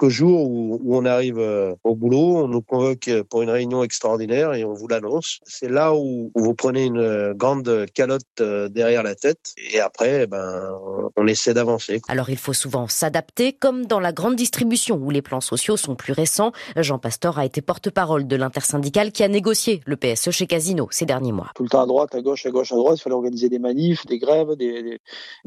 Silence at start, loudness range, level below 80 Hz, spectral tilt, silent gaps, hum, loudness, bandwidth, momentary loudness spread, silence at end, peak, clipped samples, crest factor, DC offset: 0 s; 2 LU; -62 dBFS; -4.5 dB/octave; 8.30-8.35 s, 25.00-25.04 s; none; -21 LUFS; 14.5 kHz; 6 LU; 0.1 s; -4 dBFS; under 0.1%; 16 dB; under 0.1%